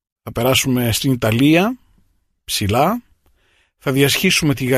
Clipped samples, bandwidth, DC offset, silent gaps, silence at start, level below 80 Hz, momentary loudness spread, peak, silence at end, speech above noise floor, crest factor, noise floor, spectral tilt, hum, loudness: under 0.1%; 15.5 kHz; under 0.1%; none; 0.25 s; -44 dBFS; 12 LU; -2 dBFS; 0 s; 44 dB; 16 dB; -60 dBFS; -4.5 dB/octave; none; -16 LUFS